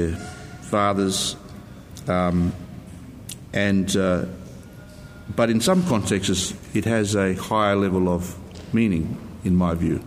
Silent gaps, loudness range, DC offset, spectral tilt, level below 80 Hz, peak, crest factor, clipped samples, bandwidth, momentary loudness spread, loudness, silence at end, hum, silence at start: none; 4 LU; under 0.1%; -5 dB/octave; -48 dBFS; -6 dBFS; 16 dB; under 0.1%; 16 kHz; 20 LU; -22 LUFS; 0 s; none; 0 s